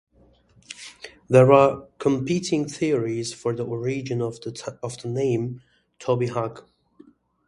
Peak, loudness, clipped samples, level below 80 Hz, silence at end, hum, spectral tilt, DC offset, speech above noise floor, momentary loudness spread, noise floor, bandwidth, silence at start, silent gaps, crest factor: 0 dBFS; -23 LUFS; under 0.1%; -60 dBFS; 0.85 s; none; -6.5 dB/octave; under 0.1%; 35 dB; 21 LU; -58 dBFS; 11.5 kHz; 0.7 s; none; 24 dB